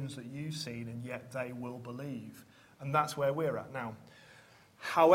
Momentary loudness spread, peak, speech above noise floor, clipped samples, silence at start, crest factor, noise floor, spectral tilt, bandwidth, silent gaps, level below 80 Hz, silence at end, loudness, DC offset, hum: 20 LU; -12 dBFS; 26 dB; under 0.1%; 0 s; 24 dB; -60 dBFS; -6 dB/octave; 16 kHz; none; -74 dBFS; 0 s; -37 LUFS; under 0.1%; none